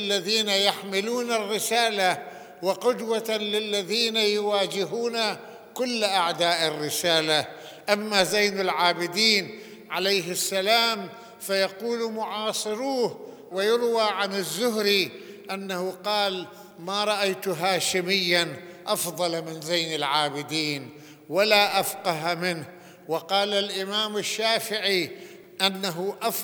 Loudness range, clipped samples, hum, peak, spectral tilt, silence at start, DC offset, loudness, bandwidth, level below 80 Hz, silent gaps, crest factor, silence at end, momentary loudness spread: 3 LU; under 0.1%; none; -2 dBFS; -2.5 dB/octave; 0 s; under 0.1%; -24 LUFS; over 20 kHz; -78 dBFS; none; 24 dB; 0 s; 11 LU